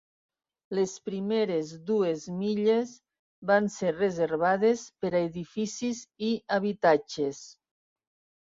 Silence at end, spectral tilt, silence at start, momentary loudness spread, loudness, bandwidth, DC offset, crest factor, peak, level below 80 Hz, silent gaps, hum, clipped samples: 0.95 s; -5.5 dB/octave; 0.7 s; 9 LU; -28 LUFS; 7.8 kHz; under 0.1%; 20 dB; -10 dBFS; -70 dBFS; 3.19-3.42 s; none; under 0.1%